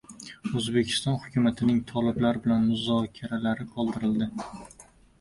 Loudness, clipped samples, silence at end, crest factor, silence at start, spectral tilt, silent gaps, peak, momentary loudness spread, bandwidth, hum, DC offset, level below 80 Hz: -27 LUFS; under 0.1%; 0.4 s; 16 dB; 0.1 s; -6 dB/octave; none; -12 dBFS; 11 LU; 11.5 kHz; none; under 0.1%; -56 dBFS